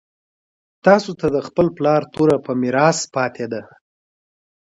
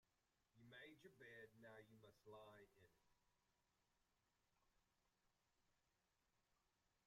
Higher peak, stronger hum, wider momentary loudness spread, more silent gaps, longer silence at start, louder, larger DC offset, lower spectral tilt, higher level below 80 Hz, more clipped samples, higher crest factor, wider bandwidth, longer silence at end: first, 0 dBFS vs -52 dBFS; neither; first, 8 LU vs 4 LU; neither; first, 0.85 s vs 0.05 s; first, -18 LUFS vs -65 LUFS; neither; about the same, -5.5 dB/octave vs -5 dB/octave; first, -54 dBFS vs under -90 dBFS; neither; about the same, 20 dB vs 18 dB; second, 11 kHz vs 14.5 kHz; first, 1.15 s vs 0 s